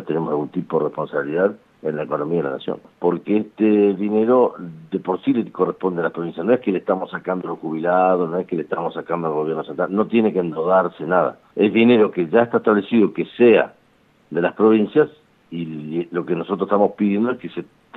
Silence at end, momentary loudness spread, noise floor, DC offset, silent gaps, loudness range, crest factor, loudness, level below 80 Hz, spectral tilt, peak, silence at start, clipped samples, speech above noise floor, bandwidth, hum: 0 s; 11 LU; -57 dBFS; under 0.1%; none; 5 LU; 18 dB; -20 LUFS; -68 dBFS; -9.5 dB/octave; -2 dBFS; 0 s; under 0.1%; 38 dB; 4.5 kHz; none